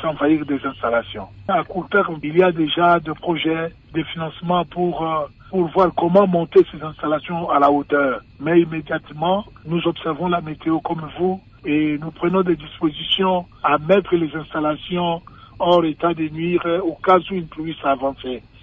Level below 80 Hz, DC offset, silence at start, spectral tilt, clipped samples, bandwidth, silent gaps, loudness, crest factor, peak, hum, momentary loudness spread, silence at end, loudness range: -50 dBFS; under 0.1%; 0 s; -8.5 dB/octave; under 0.1%; 5.2 kHz; none; -20 LUFS; 16 dB; -4 dBFS; none; 10 LU; 0.25 s; 4 LU